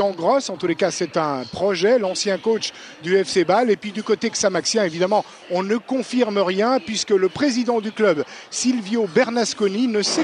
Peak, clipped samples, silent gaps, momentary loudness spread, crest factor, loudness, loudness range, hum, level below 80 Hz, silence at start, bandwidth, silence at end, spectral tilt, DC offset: -4 dBFS; under 0.1%; none; 5 LU; 16 dB; -20 LUFS; 1 LU; none; -64 dBFS; 0 s; 10.5 kHz; 0 s; -3.5 dB/octave; under 0.1%